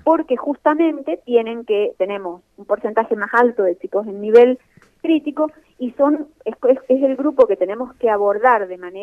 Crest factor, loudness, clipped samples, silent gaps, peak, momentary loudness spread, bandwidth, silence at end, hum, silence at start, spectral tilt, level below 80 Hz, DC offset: 16 dB; -18 LUFS; under 0.1%; none; -2 dBFS; 12 LU; 5.2 kHz; 0 s; none; 0.05 s; -7 dB/octave; -62 dBFS; under 0.1%